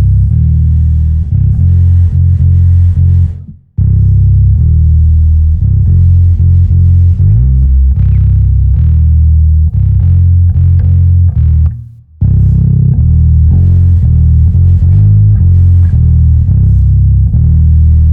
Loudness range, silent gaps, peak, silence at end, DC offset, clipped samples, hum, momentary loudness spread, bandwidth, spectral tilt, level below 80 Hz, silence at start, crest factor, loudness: 2 LU; none; 0 dBFS; 0 s; under 0.1%; under 0.1%; none; 3 LU; 0.9 kHz; -12.5 dB/octave; -10 dBFS; 0 s; 6 dB; -8 LUFS